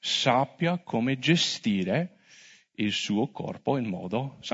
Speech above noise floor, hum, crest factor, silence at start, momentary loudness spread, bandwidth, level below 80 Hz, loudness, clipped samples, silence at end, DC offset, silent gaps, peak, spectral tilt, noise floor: 28 dB; none; 20 dB; 0 s; 9 LU; 8 kHz; -70 dBFS; -27 LUFS; under 0.1%; 0 s; under 0.1%; none; -8 dBFS; -4.5 dB/octave; -55 dBFS